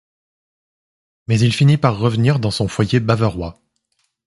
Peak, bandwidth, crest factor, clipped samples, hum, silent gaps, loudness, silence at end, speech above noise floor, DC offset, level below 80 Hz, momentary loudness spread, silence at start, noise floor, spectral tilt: 0 dBFS; 11.5 kHz; 18 dB; under 0.1%; none; none; -17 LUFS; 0.75 s; 53 dB; under 0.1%; -44 dBFS; 11 LU; 1.3 s; -68 dBFS; -6.5 dB/octave